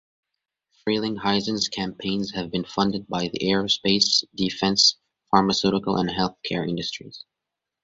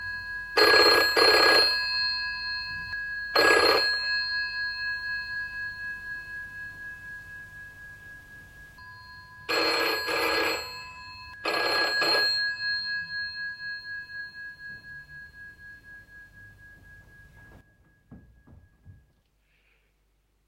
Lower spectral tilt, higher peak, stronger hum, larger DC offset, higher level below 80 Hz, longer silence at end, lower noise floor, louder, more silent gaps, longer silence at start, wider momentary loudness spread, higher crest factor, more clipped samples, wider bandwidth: first, -4 dB/octave vs -1.5 dB/octave; about the same, -2 dBFS vs -4 dBFS; neither; neither; about the same, -56 dBFS vs -56 dBFS; second, 0.65 s vs 1.55 s; first, -85 dBFS vs -69 dBFS; about the same, -23 LUFS vs -24 LUFS; neither; first, 0.85 s vs 0 s; second, 11 LU vs 26 LU; about the same, 22 dB vs 24 dB; neither; second, 7.8 kHz vs 16 kHz